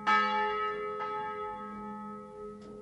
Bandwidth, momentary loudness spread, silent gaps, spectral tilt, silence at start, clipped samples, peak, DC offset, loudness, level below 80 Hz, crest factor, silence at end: 11 kHz; 18 LU; none; -4.5 dB/octave; 0 s; under 0.1%; -14 dBFS; under 0.1%; -33 LUFS; -66 dBFS; 20 dB; 0 s